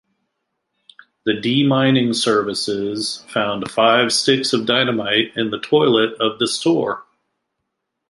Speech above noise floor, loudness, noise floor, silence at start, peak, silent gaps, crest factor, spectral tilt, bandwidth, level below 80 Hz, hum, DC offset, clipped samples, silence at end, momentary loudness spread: 59 dB; -17 LUFS; -77 dBFS; 1.25 s; 0 dBFS; none; 18 dB; -4 dB/octave; 11.5 kHz; -62 dBFS; none; under 0.1%; under 0.1%; 1.1 s; 8 LU